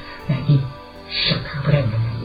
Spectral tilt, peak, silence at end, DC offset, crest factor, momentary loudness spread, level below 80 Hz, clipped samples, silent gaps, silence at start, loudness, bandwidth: -8 dB/octave; -4 dBFS; 0 s; under 0.1%; 18 dB; 9 LU; -40 dBFS; under 0.1%; none; 0 s; -20 LUFS; 5 kHz